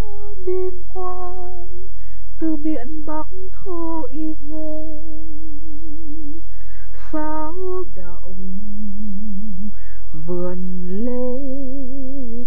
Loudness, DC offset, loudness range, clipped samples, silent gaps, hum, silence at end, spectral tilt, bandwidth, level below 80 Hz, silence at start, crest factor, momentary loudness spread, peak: -29 LUFS; 50%; 4 LU; under 0.1%; none; none; 0 s; -10 dB/octave; 17.5 kHz; -38 dBFS; 0 s; 14 dB; 14 LU; -4 dBFS